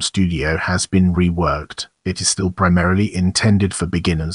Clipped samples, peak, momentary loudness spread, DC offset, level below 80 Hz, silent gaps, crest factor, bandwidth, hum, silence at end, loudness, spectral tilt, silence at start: under 0.1%; -2 dBFS; 5 LU; under 0.1%; -34 dBFS; none; 16 dB; 11 kHz; none; 0 s; -17 LUFS; -5 dB/octave; 0 s